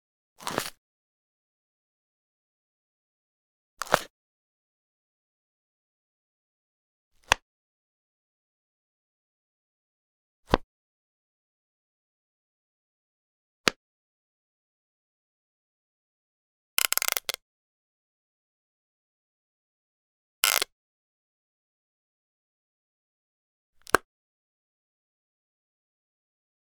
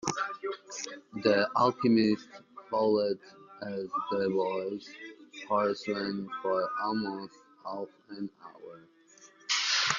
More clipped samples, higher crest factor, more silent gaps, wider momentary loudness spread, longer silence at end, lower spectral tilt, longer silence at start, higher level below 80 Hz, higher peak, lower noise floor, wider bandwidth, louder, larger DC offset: neither; first, 38 dB vs 22 dB; first, 0.78-3.77 s, 4.10-7.11 s, 7.42-10.43 s, 10.63-13.64 s, 13.76-16.77 s, 17.42-20.43 s, 20.72-23.73 s vs none; second, 14 LU vs 20 LU; first, 2.7 s vs 0 s; second, -1.5 dB/octave vs -3.5 dB/octave; first, 0.4 s vs 0 s; first, -54 dBFS vs -74 dBFS; first, 0 dBFS vs -10 dBFS; first, under -90 dBFS vs -58 dBFS; first, 19 kHz vs 7.4 kHz; first, -27 LUFS vs -31 LUFS; neither